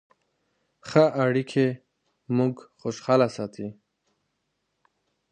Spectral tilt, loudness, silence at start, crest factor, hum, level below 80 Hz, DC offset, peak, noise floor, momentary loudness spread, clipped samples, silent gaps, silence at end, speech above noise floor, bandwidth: -7 dB/octave; -25 LUFS; 0.85 s; 24 dB; none; -68 dBFS; under 0.1%; -4 dBFS; -77 dBFS; 17 LU; under 0.1%; none; 1.6 s; 53 dB; 9.4 kHz